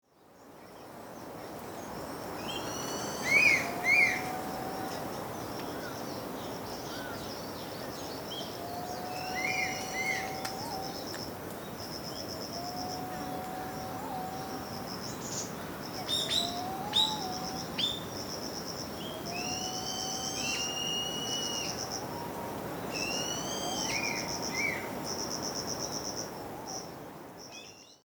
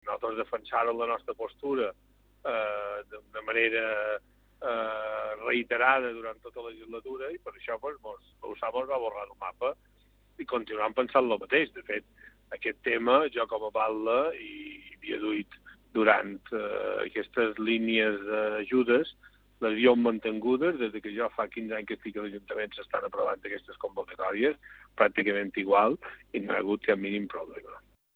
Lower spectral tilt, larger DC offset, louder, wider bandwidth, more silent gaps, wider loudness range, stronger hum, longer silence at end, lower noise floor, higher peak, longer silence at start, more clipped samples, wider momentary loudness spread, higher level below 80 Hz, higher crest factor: second, -2 dB/octave vs -7 dB/octave; neither; second, -33 LUFS vs -30 LUFS; about the same, over 20 kHz vs over 20 kHz; neither; first, 10 LU vs 7 LU; second, none vs 50 Hz at -65 dBFS; second, 0.1 s vs 0.35 s; second, -56 dBFS vs -63 dBFS; second, -12 dBFS vs -6 dBFS; first, 0.2 s vs 0.05 s; neither; second, 13 LU vs 16 LU; about the same, -62 dBFS vs -64 dBFS; about the same, 22 dB vs 24 dB